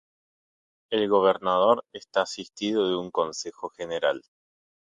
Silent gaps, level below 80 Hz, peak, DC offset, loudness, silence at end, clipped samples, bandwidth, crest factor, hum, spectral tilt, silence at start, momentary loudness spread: none; -68 dBFS; -8 dBFS; under 0.1%; -26 LUFS; 0.65 s; under 0.1%; 9.4 kHz; 20 dB; none; -4 dB/octave; 0.9 s; 12 LU